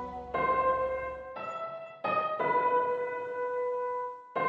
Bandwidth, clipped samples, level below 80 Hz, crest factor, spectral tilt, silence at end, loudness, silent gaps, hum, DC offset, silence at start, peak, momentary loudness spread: 7.4 kHz; under 0.1%; -60 dBFS; 14 dB; -6.5 dB/octave; 0 s; -31 LUFS; none; none; under 0.1%; 0 s; -18 dBFS; 11 LU